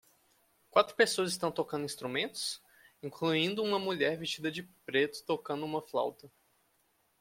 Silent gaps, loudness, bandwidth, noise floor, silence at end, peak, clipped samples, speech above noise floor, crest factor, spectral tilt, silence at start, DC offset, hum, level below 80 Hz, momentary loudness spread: none; -33 LUFS; 16.5 kHz; -74 dBFS; 0.95 s; -12 dBFS; under 0.1%; 41 dB; 22 dB; -3.5 dB/octave; 0.75 s; under 0.1%; none; -76 dBFS; 10 LU